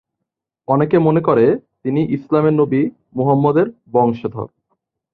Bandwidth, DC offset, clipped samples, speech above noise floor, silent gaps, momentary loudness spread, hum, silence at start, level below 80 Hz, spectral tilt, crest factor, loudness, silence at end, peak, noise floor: 4.5 kHz; under 0.1%; under 0.1%; 65 dB; none; 11 LU; none; 0.7 s; -56 dBFS; -11.5 dB/octave; 16 dB; -16 LUFS; 0.7 s; 0 dBFS; -80 dBFS